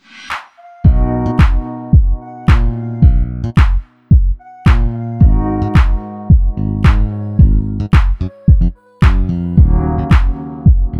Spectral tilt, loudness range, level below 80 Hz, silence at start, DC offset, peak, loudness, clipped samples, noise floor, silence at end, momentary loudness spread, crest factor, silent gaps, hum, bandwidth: -8.5 dB/octave; 1 LU; -14 dBFS; 0.15 s; under 0.1%; 0 dBFS; -14 LUFS; under 0.1%; -31 dBFS; 0 s; 7 LU; 12 dB; none; none; 6.4 kHz